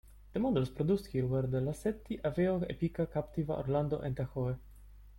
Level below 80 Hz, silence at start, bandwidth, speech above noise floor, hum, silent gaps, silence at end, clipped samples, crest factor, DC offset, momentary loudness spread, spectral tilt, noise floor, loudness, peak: -52 dBFS; 0.05 s; 16.5 kHz; 21 dB; none; none; 0 s; under 0.1%; 16 dB; under 0.1%; 5 LU; -8.5 dB/octave; -54 dBFS; -34 LUFS; -18 dBFS